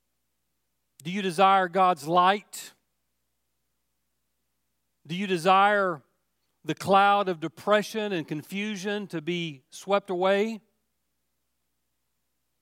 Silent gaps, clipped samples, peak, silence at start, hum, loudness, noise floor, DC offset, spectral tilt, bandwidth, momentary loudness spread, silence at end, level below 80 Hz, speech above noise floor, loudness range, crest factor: none; under 0.1%; -6 dBFS; 1.05 s; 60 Hz at -60 dBFS; -25 LUFS; -80 dBFS; under 0.1%; -5 dB/octave; 16 kHz; 18 LU; 2.05 s; -80 dBFS; 55 dB; 6 LU; 22 dB